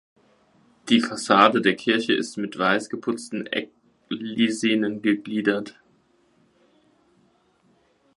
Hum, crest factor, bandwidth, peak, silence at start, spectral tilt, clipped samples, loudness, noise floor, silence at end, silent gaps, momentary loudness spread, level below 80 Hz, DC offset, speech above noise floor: none; 24 dB; 11.5 kHz; 0 dBFS; 0.85 s; -4 dB/octave; under 0.1%; -23 LUFS; -63 dBFS; 2.45 s; none; 13 LU; -72 dBFS; under 0.1%; 40 dB